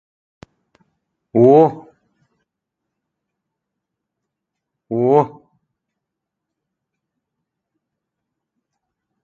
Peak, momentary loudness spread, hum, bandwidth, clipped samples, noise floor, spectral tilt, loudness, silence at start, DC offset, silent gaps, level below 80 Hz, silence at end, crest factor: 0 dBFS; 14 LU; none; 6.8 kHz; under 0.1%; -81 dBFS; -10.5 dB/octave; -15 LUFS; 1.35 s; under 0.1%; none; -66 dBFS; 3.95 s; 22 dB